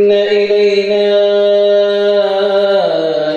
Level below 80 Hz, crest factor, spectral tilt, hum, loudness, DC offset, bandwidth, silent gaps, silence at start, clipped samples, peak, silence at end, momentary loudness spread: -58 dBFS; 10 dB; -5 dB/octave; none; -11 LUFS; under 0.1%; 7.2 kHz; none; 0 s; under 0.1%; -2 dBFS; 0 s; 2 LU